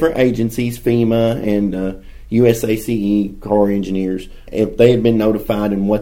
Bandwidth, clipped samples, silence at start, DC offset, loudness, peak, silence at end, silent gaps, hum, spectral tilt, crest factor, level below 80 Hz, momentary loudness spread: 16.5 kHz; under 0.1%; 0 s; under 0.1%; -16 LUFS; 0 dBFS; 0 s; none; none; -7 dB/octave; 16 dB; -36 dBFS; 8 LU